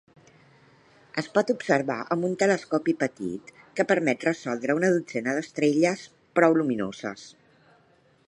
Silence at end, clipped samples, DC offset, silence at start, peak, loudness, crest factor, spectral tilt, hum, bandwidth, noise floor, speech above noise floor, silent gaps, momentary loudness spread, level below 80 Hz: 1 s; under 0.1%; under 0.1%; 1.15 s; -4 dBFS; -26 LUFS; 22 dB; -5.5 dB/octave; none; 11 kHz; -61 dBFS; 37 dB; none; 12 LU; -70 dBFS